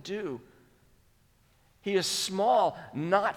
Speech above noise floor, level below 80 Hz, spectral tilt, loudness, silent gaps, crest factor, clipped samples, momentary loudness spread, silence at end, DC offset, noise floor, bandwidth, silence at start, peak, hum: 36 dB; -68 dBFS; -3.5 dB/octave; -29 LUFS; none; 20 dB; under 0.1%; 14 LU; 0 s; under 0.1%; -65 dBFS; 18.5 kHz; 0.05 s; -10 dBFS; none